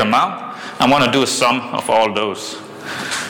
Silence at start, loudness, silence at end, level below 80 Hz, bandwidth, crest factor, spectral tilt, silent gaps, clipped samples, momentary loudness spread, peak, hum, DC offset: 0 s; -16 LUFS; 0 s; -54 dBFS; 19 kHz; 12 dB; -3.5 dB/octave; none; under 0.1%; 15 LU; -4 dBFS; none; under 0.1%